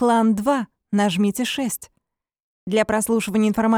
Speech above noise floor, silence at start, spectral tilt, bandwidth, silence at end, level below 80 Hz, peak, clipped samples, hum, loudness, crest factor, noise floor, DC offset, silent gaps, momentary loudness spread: 56 dB; 0 s; -5 dB/octave; 16.5 kHz; 0 s; -54 dBFS; -6 dBFS; under 0.1%; none; -21 LUFS; 14 dB; -75 dBFS; under 0.1%; 2.42-2.67 s; 7 LU